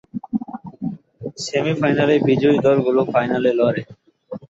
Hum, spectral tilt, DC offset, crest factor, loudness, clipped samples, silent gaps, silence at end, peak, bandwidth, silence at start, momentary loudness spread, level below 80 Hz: none; -6.5 dB/octave; under 0.1%; 16 dB; -18 LUFS; under 0.1%; none; 0.1 s; -4 dBFS; 8 kHz; 0.15 s; 15 LU; -58 dBFS